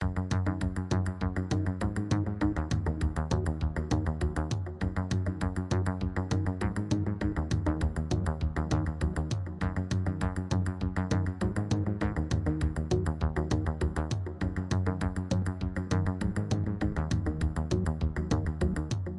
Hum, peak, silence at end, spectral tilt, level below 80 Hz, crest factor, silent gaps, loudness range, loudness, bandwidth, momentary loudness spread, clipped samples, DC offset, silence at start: none; -12 dBFS; 0 s; -7 dB/octave; -38 dBFS; 18 dB; none; 1 LU; -31 LUFS; 11 kHz; 3 LU; under 0.1%; under 0.1%; 0 s